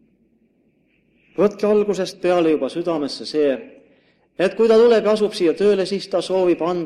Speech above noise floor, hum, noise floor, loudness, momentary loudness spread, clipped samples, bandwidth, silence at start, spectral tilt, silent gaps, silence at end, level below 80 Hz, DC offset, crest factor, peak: 44 dB; none; -61 dBFS; -19 LUFS; 9 LU; under 0.1%; 11.5 kHz; 1.4 s; -5.5 dB/octave; none; 0 s; -62 dBFS; under 0.1%; 16 dB; -4 dBFS